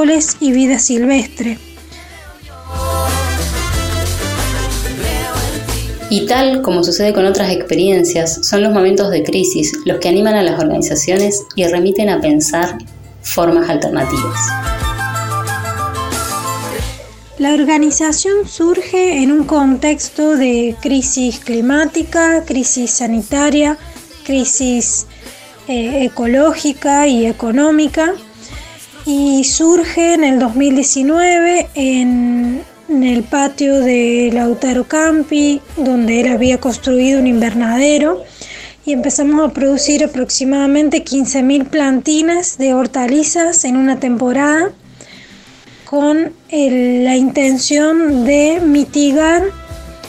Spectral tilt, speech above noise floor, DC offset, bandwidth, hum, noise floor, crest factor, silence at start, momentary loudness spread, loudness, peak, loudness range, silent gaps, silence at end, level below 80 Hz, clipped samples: -4 dB/octave; 27 dB; under 0.1%; 17 kHz; none; -40 dBFS; 14 dB; 0 s; 8 LU; -13 LUFS; 0 dBFS; 4 LU; none; 0 s; -32 dBFS; under 0.1%